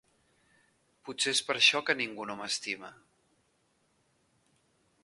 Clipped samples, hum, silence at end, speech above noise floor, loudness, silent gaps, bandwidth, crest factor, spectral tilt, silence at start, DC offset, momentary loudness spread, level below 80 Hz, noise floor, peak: under 0.1%; none; 2.1 s; 42 dB; -29 LUFS; none; 11.5 kHz; 26 dB; -0.5 dB/octave; 1.05 s; under 0.1%; 20 LU; -80 dBFS; -73 dBFS; -10 dBFS